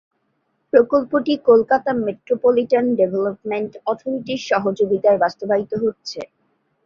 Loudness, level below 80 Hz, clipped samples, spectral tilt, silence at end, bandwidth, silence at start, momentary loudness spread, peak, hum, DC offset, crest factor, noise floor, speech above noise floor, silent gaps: -19 LUFS; -60 dBFS; under 0.1%; -6 dB/octave; 0.6 s; 7 kHz; 0.75 s; 10 LU; -2 dBFS; none; under 0.1%; 18 dB; -69 dBFS; 51 dB; none